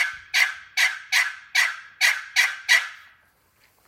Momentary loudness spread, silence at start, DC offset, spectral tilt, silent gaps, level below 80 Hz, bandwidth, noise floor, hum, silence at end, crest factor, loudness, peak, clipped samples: 3 LU; 0 s; under 0.1%; 4.5 dB/octave; none; -72 dBFS; 16.5 kHz; -62 dBFS; none; 0.9 s; 20 dB; -21 LUFS; -4 dBFS; under 0.1%